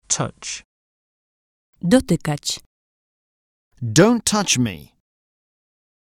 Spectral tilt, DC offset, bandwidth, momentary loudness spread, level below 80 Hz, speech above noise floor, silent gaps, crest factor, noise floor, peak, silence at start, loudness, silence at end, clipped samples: -4 dB/octave; under 0.1%; 16.5 kHz; 15 LU; -50 dBFS; over 71 dB; 0.65-1.73 s, 2.66-3.71 s; 22 dB; under -90 dBFS; 0 dBFS; 0.1 s; -19 LUFS; 1.2 s; under 0.1%